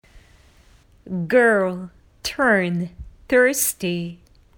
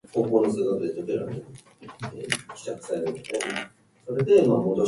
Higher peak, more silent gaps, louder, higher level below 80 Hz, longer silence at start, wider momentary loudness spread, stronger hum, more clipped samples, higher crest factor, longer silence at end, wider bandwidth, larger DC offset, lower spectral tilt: about the same, -4 dBFS vs -6 dBFS; neither; first, -20 LUFS vs -25 LUFS; first, -50 dBFS vs -64 dBFS; about the same, 0.15 s vs 0.15 s; about the same, 17 LU vs 19 LU; neither; neither; about the same, 18 dB vs 20 dB; first, 0.4 s vs 0 s; first, over 20 kHz vs 11.5 kHz; neither; second, -4 dB/octave vs -5.5 dB/octave